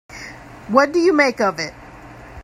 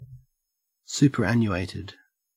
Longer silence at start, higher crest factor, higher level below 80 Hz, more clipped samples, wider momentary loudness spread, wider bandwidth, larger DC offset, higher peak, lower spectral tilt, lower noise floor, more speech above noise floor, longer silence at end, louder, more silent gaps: about the same, 0.1 s vs 0 s; about the same, 20 dB vs 20 dB; first, -50 dBFS vs -56 dBFS; neither; first, 22 LU vs 17 LU; second, 13.5 kHz vs 15.5 kHz; neither; first, 0 dBFS vs -6 dBFS; second, -4.5 dB/octave vs -6 dB/octave; second, -39 dBFS vs -80 dBFS; second, 23 dB vs 57 dB; second, 0 s vs 0.45 s; first, -17 LUFS vs -24 LUFS; neither